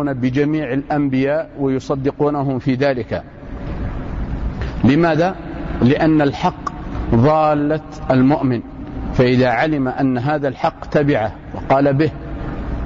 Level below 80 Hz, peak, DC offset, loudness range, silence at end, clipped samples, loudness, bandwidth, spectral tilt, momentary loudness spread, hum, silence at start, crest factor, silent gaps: -32 dBFS; -4 dBFS; under 0.1%; 4 LU; 0 s; under 0.1%; -18 LUFS; 7.4 kHz; -8.5 dB/octave; 13 LU; none; 0 s; 12 dB; none